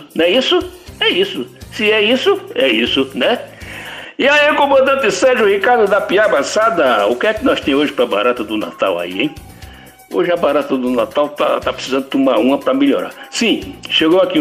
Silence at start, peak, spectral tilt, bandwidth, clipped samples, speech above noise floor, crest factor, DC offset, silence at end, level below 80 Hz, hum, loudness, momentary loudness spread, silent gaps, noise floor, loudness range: 0 s; -2 dBFS; -3.5 dB/octave; 16 kHz; under 0.1%; 23 dB; 12 dB; under 0.1%; 0 s; -46 dBFS; none; -14 LUFS; 9 LU; none; -37 dBFS; 5 LU